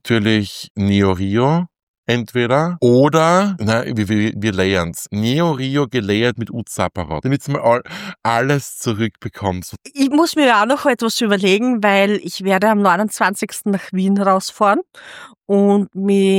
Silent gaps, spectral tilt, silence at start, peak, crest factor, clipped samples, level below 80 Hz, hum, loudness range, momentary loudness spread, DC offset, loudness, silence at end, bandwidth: 0.70-0.75 s, 1.83-2.03 s; -5.5 dB/octave; 0.05 s; -2 dBFS; 14 dB; under 0.1%; -50 dBFS; none; 4 LU; 10 LU; under 0.1%; -17 LUFS; 0 s; 16.5 kHz